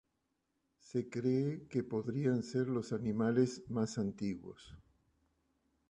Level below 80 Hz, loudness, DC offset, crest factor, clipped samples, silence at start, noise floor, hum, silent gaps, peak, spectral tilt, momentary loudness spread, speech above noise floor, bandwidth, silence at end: -68 dBFS; -36 LUFS; under 0.1%; 20 dB; under 0.1%; 0.85 s; -83 dBFS; none; none; -18 dBFS; -7.5 dB/octave; 8 LU; 47 dB; 10.5 kHz; 1.1 s